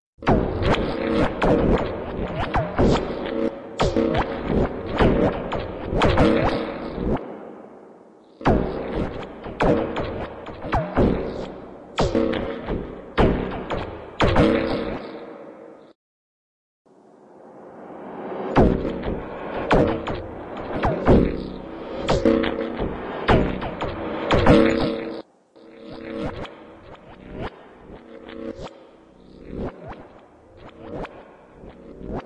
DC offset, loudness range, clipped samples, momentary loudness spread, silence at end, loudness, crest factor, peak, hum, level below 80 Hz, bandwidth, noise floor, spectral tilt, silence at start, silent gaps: under 0.1%; 15 LU; under 0.1%; 21 LU; 0 s; -23 LUFS; 20 dB; -4 dBFS; none; -34 dBFS; 10.5 kHz; -50 dBFS; -7 dB/octave; 0.2 s; 15.95-16.85 s